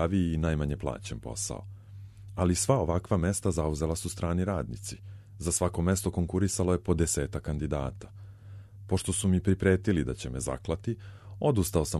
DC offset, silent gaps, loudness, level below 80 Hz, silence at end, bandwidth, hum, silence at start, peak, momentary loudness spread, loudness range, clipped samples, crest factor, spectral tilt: under 0.1%; none; -30 LUFS; -42 dBFS; 0 s; 13 kHz; none; 0 s; -10 dBFS; 20 LU; 1 LU; under 0.1%; 18 dB; -5.5 dB/octave